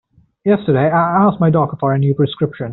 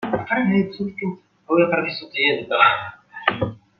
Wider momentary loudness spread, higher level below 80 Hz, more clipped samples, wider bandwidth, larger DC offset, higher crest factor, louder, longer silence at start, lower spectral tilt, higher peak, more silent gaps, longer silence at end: second, 5 LU vs 12 LU; about the same, -52 dBFS vs -56 dBFS; neither; second, 4.1 kHz vs 5.6 kHz; neither; second, 12 dB vs 20 dB; first, -15 LUFS vs -20 LUFS; first, 0.45 s vs 0 s; about the same, -7 dB/octave vs -8 dB/octave; about the same, -2 dBFS vs -2 dBFS; neither; second, 0 s vs 0.25 s